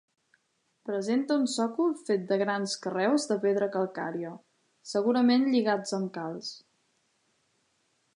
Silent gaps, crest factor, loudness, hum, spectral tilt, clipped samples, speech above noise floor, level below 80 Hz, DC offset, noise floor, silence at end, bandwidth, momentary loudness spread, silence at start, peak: none; 16 dB; -28 LUFS; none; -5 dB/octave; under 0.1%; 47 dB; -84 dBFS; under 0.1%; -74 dBFS; 1.55 s; 11 kHz; 13 LU; 0.85 s; -12 dBFS